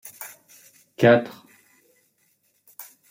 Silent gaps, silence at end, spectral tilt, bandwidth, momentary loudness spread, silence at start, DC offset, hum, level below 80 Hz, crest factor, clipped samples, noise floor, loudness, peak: none; 0.3 s; -6 dB/octave; 16.5 kHz; 25 LU; 0.2 s; under 0.1%; none; -70 dBFS; 22 dB; under 0.1%; -67 dBFS; -19 LUFS; -4 dBFS